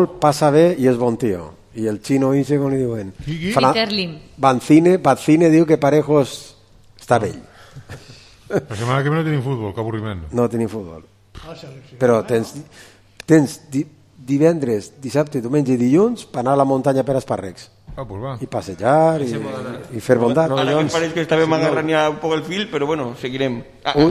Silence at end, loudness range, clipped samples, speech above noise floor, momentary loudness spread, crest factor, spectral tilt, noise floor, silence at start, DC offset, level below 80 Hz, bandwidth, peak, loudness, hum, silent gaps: 0 s; 7 LU; under 0.1%; 29 dB; 15 LU; 18 dB; -6.5 dB/octave; -47 dBFS; 0 s; under 0.1%; -48 dBFS; 14.5 kHz; 0 dBFS; -18 LUFS; none; none